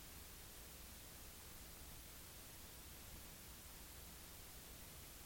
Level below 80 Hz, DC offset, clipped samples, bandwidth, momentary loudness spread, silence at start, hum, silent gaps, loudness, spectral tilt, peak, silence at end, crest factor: -64 dBFS; under 0.1%; under 0.1%; 17 kHz; 0 LU; 0 s; none; none; -56 LUFS; -2.5 dB/octave; -44 dBFS; 0 s; 14 dB